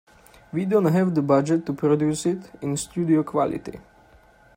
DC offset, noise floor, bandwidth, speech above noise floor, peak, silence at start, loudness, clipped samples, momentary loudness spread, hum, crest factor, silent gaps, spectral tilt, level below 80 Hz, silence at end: under 0.1%; -54 dBFS; 16 kHz; 32 dB; -6 dBFS; 0.55 s; -23 LUFS; under 0.1%; 10 LU; none; 18 dB; none; -7 dB/octave; -58 dBFS; 0.75 s